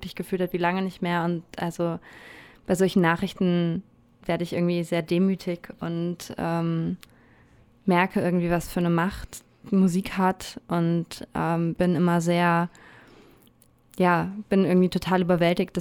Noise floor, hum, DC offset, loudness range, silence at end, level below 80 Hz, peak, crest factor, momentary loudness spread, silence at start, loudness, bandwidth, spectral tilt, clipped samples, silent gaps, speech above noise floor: -58 dBFS; none; under 0.1%; 3 LU; 0 s; -52 dBFS; -8 dBFS; 16 dB; 11 LU; 0 s; -25 LUFS; 16 kHz; -7 dB/octave; under 0.1%; none; 34 dB